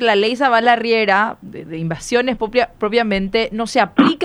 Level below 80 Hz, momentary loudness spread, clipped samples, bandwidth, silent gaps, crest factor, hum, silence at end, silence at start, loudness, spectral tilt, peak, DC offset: -46 dBFS; 11 LU; under 0.1%; 12 kHz; none; 16 dB; none; 0 s; 0 s; -16 LUFS; -5 dB/octave; 0 dBFS; under 0.1%